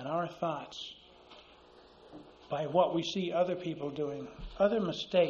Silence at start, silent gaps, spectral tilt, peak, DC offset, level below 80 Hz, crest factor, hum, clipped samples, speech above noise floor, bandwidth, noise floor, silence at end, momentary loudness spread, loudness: 0 s; none; -4.5 dB/octave; -14 dBFS; under 0.1%; -58 dBFS; 20 dB; none; under 0.1%; 26 dB; 7.4 kHz; -58 dBFS; 0 s; 24 LU; -33 LUFS